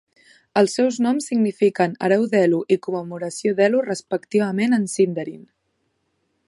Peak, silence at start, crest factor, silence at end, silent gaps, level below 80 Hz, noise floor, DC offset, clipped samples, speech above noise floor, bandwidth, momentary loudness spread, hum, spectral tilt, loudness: -4 dBFS; 0.55 s; 16 dB; 1.1 s; none; -72 dBFS; -71 dBFS; under 0.1%; under 0.1%; 51 dB; 11.5 kHz; 8 LU; none; -5.5 dB/octave; -20 LUFS